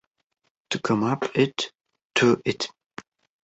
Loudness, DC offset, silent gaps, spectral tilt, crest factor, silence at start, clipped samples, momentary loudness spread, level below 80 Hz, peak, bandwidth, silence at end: -25 LUFS; under 0.1%; 2.05-2.10 s; -5 dB/octave; 20 dB; 0.7 s; under 0.1%; 19 LU; -64 dBFS; -6 dBFS; 8.2 kHz; 0.75 s